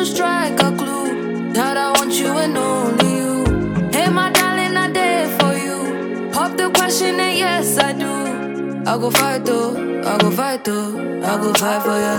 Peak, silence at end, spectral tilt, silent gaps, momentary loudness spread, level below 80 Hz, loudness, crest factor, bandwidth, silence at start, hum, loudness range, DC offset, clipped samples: 0 dBFS; 0 s; -3.5 dB/octave; none; 7 LU; -38 dBFS; -17 LUFS; 16 dB; 17.5 kHz; 0 s; none; 2 LU; under 0.1%; under 0.1%